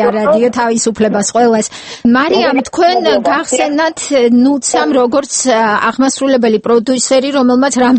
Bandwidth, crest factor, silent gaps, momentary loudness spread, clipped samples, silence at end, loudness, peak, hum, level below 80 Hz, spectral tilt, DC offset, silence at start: 8.8 kHz; 10 dB; none; 3 LU; under 0.1%; 0 s; -11 LUFS; 0 dBFS; none; -50 dBFS; -3.5 dB/octave; under 0.1%; 0 s